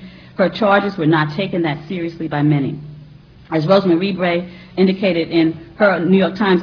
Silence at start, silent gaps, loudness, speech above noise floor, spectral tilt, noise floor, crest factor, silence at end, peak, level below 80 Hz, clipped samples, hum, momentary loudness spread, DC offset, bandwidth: 0 s; none; -17 LUFS; 25 dB; -8.5 dB/octave; -41 dBFS; 16 dB; 0 s; 0 dBFS; -52 dBFS; under 0.1%; none; 10 LU; under 0.1%; 5.4 kHz